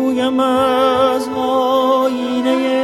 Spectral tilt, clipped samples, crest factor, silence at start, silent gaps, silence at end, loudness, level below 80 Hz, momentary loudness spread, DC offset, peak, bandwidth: -4.5 dB/octave; under 0.1%; 14 dB; 0 s; none; 0 s; -15 LUFS; -52 dBFS; 4 LU; under 0.1%; -2 dBFS; 15 kHz